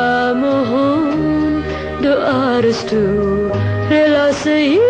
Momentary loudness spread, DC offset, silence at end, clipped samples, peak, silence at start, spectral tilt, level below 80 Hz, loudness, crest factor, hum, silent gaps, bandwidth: 5 LU; under 0.1%; 0 s; under 0.1%; -2 dBFS; 0 s; -6.5 dB/octave; -38 dBFS; -15 LUFS; 12 dB; none; none; 9 kHz